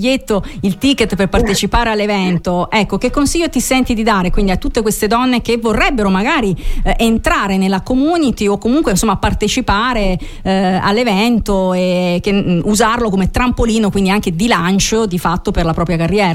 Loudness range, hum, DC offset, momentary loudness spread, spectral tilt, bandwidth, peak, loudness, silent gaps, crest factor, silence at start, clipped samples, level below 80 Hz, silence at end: 1 LU; none; under 0.1%; 4 LU; -5 dB/octave; 16 kHz; 0 dBFS; -14 LUFS; none; 12 dB; 0 s; under 0.1%; -24 dBFS; 0 s